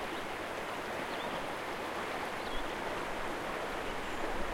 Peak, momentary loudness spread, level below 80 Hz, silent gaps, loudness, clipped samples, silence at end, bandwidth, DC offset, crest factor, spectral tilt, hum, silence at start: -22 dBFS; 1 LU; -50 dBFS; none; -38 LUFS; under 0.1%; 0 s; 16.5 kHz; under 0.1%; 16 dB; -3.5 dB/octave; none; 0 s